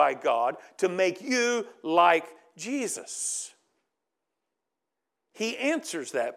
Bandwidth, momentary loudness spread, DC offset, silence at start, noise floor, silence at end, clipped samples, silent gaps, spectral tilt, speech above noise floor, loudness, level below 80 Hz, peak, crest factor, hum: 15.5 kHz; 11 LU; under 0.1%; 0 s; -86 dBFS; 0 s; under 0.1%; none; -2.5 dB/octave; 58 dB; -27 LUFS; under -90 dBFS; -6 dBFS; 22 dB; none